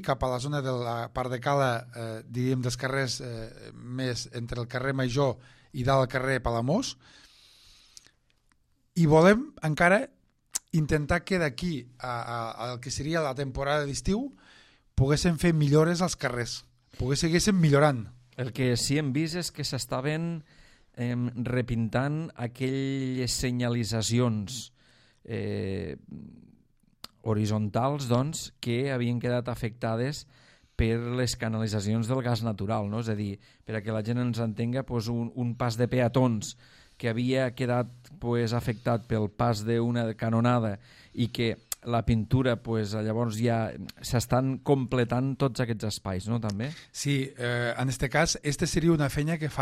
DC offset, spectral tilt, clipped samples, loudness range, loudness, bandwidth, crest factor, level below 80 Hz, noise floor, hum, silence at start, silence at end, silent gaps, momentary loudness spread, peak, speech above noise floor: under 0.1%; -5.5 dB/octave; under 0.1%; 5 LU; -28 LUFS; 15.5 kHz; 20 dB; -48 dBFS; -68 dBFS; none; 0 s; 0 s; none; 11 LU; -8 dBFS; 40 dB